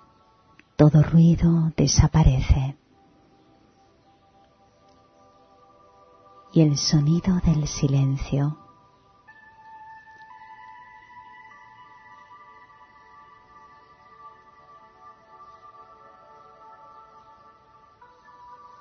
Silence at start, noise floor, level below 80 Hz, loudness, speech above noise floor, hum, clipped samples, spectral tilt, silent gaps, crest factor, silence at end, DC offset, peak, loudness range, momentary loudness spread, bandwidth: 0.8 s; -58 dBFS; -36 dBFS; -20 LUFS; 40 dB; none; under 0.1%; -6.5 dB/octave; none; 22 dB; 0.25 s; under 0.1%; -4 dBFS; 26 LU; 29 LU; 6.6 kHz